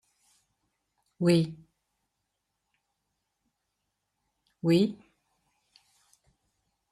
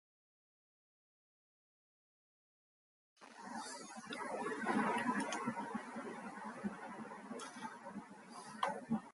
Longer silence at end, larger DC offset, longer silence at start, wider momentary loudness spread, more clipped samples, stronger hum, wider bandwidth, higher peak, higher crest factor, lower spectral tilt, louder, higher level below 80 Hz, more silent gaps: first, 1.95 s vs 0 s; neither; second, 1.2 s vs 3.2 s; second, 10 LU vs 15 LU; neither; neither; first, 14 kHz vs 11.5 kHz; first, -12 dBFS vs -22 dBFS; about the same, 22 dB vs 22 dB; first, -7 dB/octave vs -4.5 dB/octave; first, -27 LUFS vs -43 LUFS; first, -72 dBFS vs -84 dBFS; neither